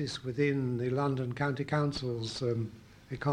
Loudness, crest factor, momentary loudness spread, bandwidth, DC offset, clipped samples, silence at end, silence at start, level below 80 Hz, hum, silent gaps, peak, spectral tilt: -33 LUFS; 16 dB; 6 LU; 10.5 kHz; under 0.1%; under 0.1%; 0 s; 0 s; -60 dBFS; none; none; -16 dBFS; -6.5 dB/octave